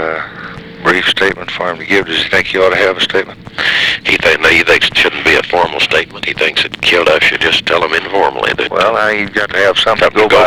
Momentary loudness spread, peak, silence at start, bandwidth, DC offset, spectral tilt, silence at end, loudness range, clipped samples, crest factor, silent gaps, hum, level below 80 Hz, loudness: 9 LU; 0 dBFS; 0 s; 19.5 kHz; 0.2%; -3 dB/octave; 0 s; 2 LU; under 0.1%; 12 dB; none; none; -40 dBFS; -11 LUFS